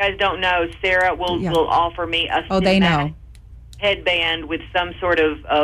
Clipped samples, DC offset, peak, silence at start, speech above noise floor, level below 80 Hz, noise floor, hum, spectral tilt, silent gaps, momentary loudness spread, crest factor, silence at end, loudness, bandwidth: under 0.1%; under 0.1%; -6 dBFS; 0 s; 21 dB; -38 dBFS; -40 dBFS; none; -5.5 dB/octave; none; 6 LU; 12 dB; 0 s; -19 LUFS; 13.5 kHz